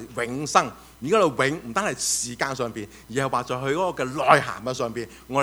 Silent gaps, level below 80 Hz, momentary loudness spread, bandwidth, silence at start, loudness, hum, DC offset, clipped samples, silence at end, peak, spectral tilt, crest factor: none; -54 dBFS; 12 LU; over 20 kHz; 0 s; -24 LUFS; none; under 0.1%; under 0.1%; 0 s; 0 dBFS; -3.5 dB/octave; 24 dB